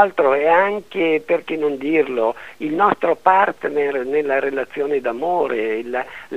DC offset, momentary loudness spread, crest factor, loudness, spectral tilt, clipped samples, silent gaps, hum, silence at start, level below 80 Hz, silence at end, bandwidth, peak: 0.4%; 8 LU; 18 dB; -19 LUFS; -6 dB/octave; under 0.1%; none; none; 0 s; -60 dBFS; 0 s; 10.5 kHz; 0 dBFS